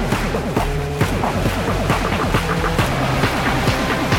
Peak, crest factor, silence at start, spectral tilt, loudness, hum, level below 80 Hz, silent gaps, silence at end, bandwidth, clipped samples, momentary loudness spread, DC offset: -6 dBFS; 12 dB; 0 s; -5.5 dB/octave; -19 LUFS; none; -28 dBFS; none; 0 s; 17.5 kHz; under 0.1%; 3 LU; under 0.1%